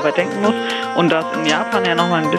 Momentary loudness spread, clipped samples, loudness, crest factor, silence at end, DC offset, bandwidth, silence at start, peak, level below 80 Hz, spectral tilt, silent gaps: 2 LU; under 0.1%; -17 LUFS; 16 dB; 0 s; under 0.1%; 14 kHz; 0 s; 0 dBFS; -64 dBFS; -5 dB/octave; none